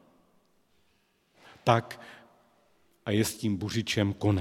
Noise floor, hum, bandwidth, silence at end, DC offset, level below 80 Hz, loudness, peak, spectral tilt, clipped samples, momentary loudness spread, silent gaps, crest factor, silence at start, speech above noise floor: -70 dBFS; none; 16.5 kHz; 0 s; under 0.1%; -62 dBFS; -29 LUFS; -6 dBFS; -5.5 dB/octave; under 0.1%; 18 LU; none; 26 dB; 1.65 s; 42 dB